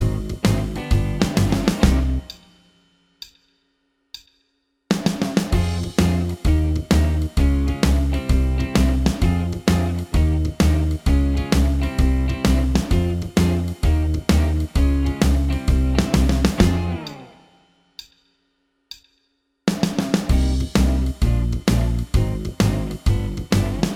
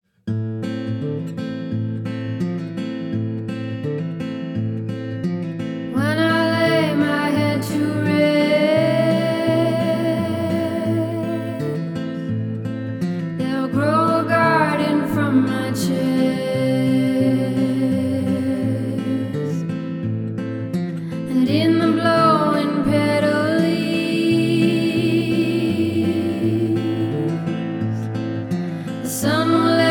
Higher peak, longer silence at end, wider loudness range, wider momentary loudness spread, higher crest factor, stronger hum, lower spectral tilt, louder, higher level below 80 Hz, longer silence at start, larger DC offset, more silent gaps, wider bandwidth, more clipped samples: about the same, -2 dBFS vs -4 dBFS; about the same, 0 s vs 0 s; about the same, 6 LU vs 8 LU; about the same, 9 LU vs 10 LU; about the same, 18 dB vs 16 dB; neither; about the same, -6.5 dB/octave vs -6.5 dB/octave; about the same, -20 LUFS vs -20 LUFS; first, -22 dBFS vs -56 dBFS; second, 0 s vs 0.25 s; neither; neither; second, 16 kHz vs 19 kHz; neither